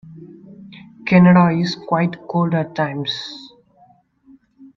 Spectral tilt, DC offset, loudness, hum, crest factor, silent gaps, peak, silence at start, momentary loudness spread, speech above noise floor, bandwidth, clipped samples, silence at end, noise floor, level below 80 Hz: -7.5 dB/octave; under 0.1%; -17 LUFS; none; 18 dB; none; -2 dBFS; 0.05 s; 17 LU; 37 dB; 6.2 kHz; under 0.1%; 0.1 s; -53 dBFS; -58 dBFS